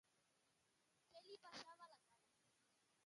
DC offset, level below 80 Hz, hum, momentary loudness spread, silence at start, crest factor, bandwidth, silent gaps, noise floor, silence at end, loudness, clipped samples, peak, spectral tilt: under 0.1%; under -90 dBFS; none; 9 LU; 0.05 s; 26 dB; 11 kHz; none; -84 dBFS; 0 s; -62 LUFS; under 0.1%; -42 dBFS; -2 dB/octave